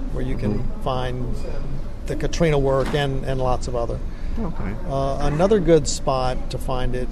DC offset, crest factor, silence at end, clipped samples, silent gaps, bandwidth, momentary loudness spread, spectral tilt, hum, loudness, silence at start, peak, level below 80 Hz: under 0.1%; 16 dB; 0 s; under 0.1%; none; 12 kHz; 12 LU; -6 dB/octave; none; -23 LUFS; 0 s; -4 dBFS; -26 dBFS